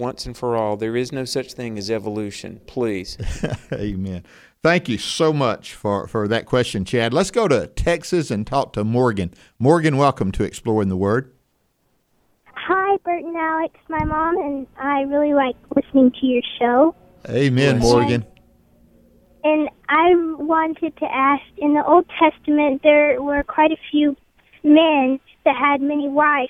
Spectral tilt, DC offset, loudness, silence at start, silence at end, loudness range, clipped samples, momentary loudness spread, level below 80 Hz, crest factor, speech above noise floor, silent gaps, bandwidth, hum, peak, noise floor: -6 dB/octave; under 0.1%; -19 LUFS; 0 s; 0 s; 7 LU; under 0.1%; 11 LU; -40 dBFS; 18 dB; 47 dB; none; 13.5 kHz; none; -2 dBFS; -66 dBFS